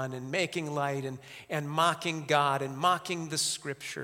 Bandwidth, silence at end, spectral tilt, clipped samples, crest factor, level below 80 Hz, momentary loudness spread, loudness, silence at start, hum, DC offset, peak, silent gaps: 16.5 kHz; 0 s; -3.5 dB/octave; under 0.1%; 22 dB; -74 dBFS; 10 LU; -30 LUFS; 0 s; none; under 0.1%; -10 dBFS; none